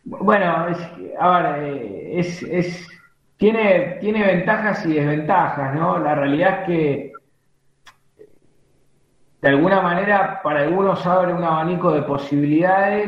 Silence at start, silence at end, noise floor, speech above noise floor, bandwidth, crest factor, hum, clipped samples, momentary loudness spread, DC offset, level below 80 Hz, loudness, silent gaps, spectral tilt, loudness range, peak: 0.05 s; 0 s; -61 dBFS; 43 dB; 7.6 kHz; 18 dB; none; under 0.1%; 9 LU; under 0.1%; -58 dBFS; -19 LUFS; none; -8 dB/octave; 5 LU; 0 dBFS